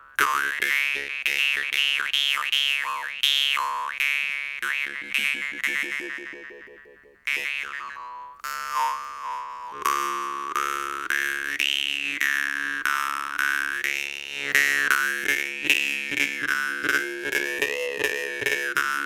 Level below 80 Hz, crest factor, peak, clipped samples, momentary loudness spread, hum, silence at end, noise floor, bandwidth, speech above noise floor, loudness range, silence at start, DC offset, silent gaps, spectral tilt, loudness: -66 dBFS; 24 dB; -2 dBFS; under 0.1%; 11 LU; none; 0 s; -51 dBFS; 19 kHz; 25 dB; 7 LU; 0 s; under 0.1%; none; 0.5 dB/octave; -24 LUFS